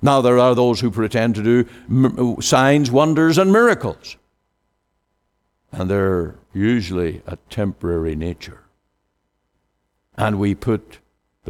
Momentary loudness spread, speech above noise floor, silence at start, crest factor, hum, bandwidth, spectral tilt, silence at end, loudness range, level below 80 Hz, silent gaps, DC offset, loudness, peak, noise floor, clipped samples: 15 LU; 54 dB; 0 s; 16 dB; none; 16.5 kHz; -6 dB/octave; 0 s; 10 LU; -44 dBFS; none; under 0.1%; -18 LUFS; -2 dBFS; -71 dBFS; under 0.1%